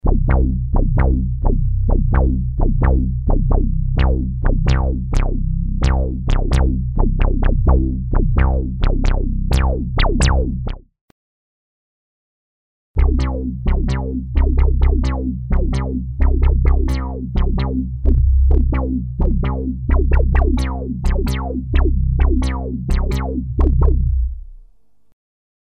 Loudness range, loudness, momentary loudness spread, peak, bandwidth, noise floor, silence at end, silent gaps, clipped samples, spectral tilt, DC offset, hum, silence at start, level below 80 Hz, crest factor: 4 LU; -19 LUFS; 6 LU; -2 dBFS; 9 kHz; -52 dBFS; 1.2 s; 11.01-12.94 s; under 0.1%; -7.5 dB/octave; 0.4%; none; 0.05 s; -16 dBFS; 12 dB